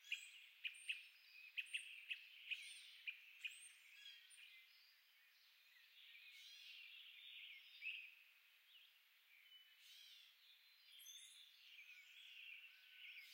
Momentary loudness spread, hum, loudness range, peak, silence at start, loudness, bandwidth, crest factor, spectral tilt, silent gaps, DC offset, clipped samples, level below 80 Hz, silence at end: 17 LU; none; 11 LU; -34 dBFS; 0 s; -55 LUFS; 16 kHz; 24 dB; 6.5 dB/octave; none; under 0.1%; under 0.1%; under -90 dBFS; 0 s